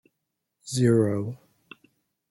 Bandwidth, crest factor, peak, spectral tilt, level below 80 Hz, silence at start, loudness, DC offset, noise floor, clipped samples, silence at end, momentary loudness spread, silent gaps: 12 kHz; 18 dB; -8 dBFS; -6.5 dB/octave; -64 dBFS; 0.65 s; -25 LUFS; under 0.1%; -81 dBFS; under 0.1%; 0.95 s; 24 LU; none